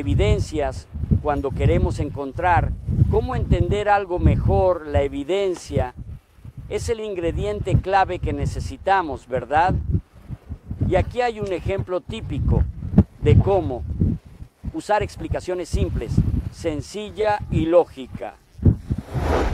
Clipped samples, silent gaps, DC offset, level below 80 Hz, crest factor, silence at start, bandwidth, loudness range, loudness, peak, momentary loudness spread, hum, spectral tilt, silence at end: under 0.1%; none; under 0.1%; -30 dBFS; 18 dB; 0 s; 11.5 kHz; 4 LU; -22 LUFS; -4 dBFS; 13 LU; none; -7.5 dB/octave; 0 s